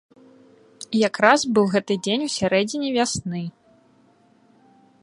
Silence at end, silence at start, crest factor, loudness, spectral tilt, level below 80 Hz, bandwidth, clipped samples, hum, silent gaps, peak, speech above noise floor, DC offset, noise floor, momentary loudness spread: 1.55 s; 0.8 s; 22 dB; -21 LUFS; -4 dB/octave; -60 dBFS; 11.5 kHz; under 0.1%; none; none; 0 dBFS; 37 dB; under 0.1%; -57 dBFS; 14 LU